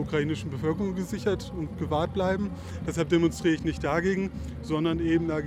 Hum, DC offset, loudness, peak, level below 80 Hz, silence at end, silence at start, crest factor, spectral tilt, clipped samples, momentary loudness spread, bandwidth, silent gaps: none; under 0.1%; -28 LUFS; -12 dBFS; -44 dBFS; 0 s; 0 s; 16 dB; -6.5 dB/octave; under 0.1%; 9 LU; 14 kHz; none